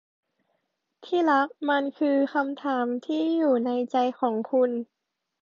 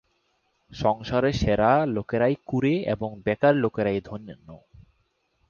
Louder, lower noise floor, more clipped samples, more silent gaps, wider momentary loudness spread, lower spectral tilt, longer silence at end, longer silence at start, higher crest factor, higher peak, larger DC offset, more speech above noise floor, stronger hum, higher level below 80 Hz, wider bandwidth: about the same, -25 LUFS vs -24 LUFS; first, -77 dBFS vs -71 dBFS; neither; neither; second, 5 LU vs 9 LU; second, -6 dB/octave vs -7.5 dB/octave; about the same, 0.6 s vs 0.7 s; first, 1 s vs 0.7 s; about the same, 16 dB vs 18 dB; second, -10 dBFS vs -6 dBFS; neither; first, 53 dB vs 47 dB; neither; second, -80 dBFS vs -46 dBFS; about the same, 7.2 kHz vs 7.2 kHz